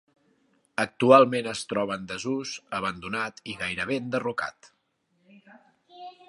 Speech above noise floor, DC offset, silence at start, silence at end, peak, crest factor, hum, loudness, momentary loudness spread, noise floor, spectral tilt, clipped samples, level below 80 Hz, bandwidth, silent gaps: 46 dB; under 0.1%; 0.8 s; 0.2 s; -2 dBFS; 26 dB; none; -26 LUFS; 15 LU; -72 dBFS; -4.5 dB/octave; under 0.1%; -64 dBFS; 11.5 kHz; none